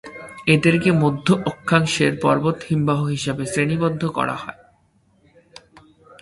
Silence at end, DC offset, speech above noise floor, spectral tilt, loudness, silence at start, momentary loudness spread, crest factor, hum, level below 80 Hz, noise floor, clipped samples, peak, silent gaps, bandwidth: 1.7 s; under 0.1%; 41 dB; -6 dB/octave; -19 LUFS; 0.05 s; 8 LU; 20 dB; none; -52 dBFS; -60 dBFS; under 0.1%; 0 dBFS; none; 11.5 kHz